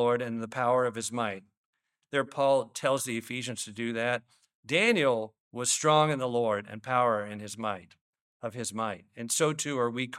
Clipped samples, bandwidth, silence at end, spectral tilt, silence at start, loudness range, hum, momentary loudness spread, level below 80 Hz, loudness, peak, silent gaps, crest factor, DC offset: under 0.1%; 16 kHz; 0 s; -3.5 dB/octave; 0 s; 4 LU; none; 11 LU; -76 dBFS; -29 LUFS; -10 dBFS; 1.57-1.73 s, 4.55-4.63 s, 5.40-5.51 s, 8.01-8.13 s, 8.21-8.40 s; 20 dB; under 0.1%